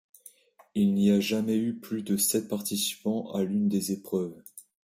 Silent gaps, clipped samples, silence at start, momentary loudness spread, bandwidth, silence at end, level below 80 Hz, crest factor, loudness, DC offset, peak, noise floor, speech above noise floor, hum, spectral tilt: none; under 0.1%; 0.75 s; 11 LU; 16 kHz; 0.25 s; -68 dBFS; 16 dB; -28 LUFS; under 0.1%; -12 dBFS; -55 dBFS; 28 dB; none; -4.5 dB/octave